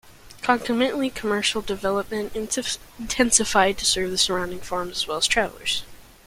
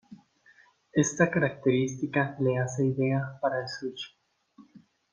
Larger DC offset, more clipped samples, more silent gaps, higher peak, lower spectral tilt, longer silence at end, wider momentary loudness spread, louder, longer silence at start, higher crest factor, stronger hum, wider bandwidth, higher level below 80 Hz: neither; neither; neither; first, -2 dBFS vs -10 dBFS; second, -2 dB/octave vs -5.5 dB/octave; about the same, 0.25 s vs 0.35 s; about the same, 10 LU vs 11 LU; first, -23 LUFS vs -28 LUFS; about the same, 0.05 s vs 0.1 s; about the same, 22 dB vs 20 dB; neither; first, 16.5 kHz vs 9.8 kHz; first, -46 dBFS vs -68 dBFS